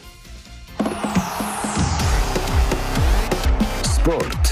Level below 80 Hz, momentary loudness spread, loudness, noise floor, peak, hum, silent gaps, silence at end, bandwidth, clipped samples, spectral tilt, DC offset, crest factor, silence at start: -22 dBFS; 15 LU; -21 LUFS; -39 dBFS; -6 dBFS; none; none; 0 s; 15.5 kHz; under 0.1%; -5 dB/octave; under 0.1%; 14 dB; 0.05 s